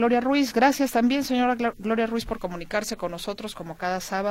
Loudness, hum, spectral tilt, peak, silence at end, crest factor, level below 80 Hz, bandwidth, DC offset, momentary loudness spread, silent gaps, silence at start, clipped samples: -25 LUFS; none; -4 dB/octave; -8 dBFS; 0 s; 18 dB; -50 dBFS; 16.5 kHz; under 0.1%; 11 LU; none; 0 s; under 0.1%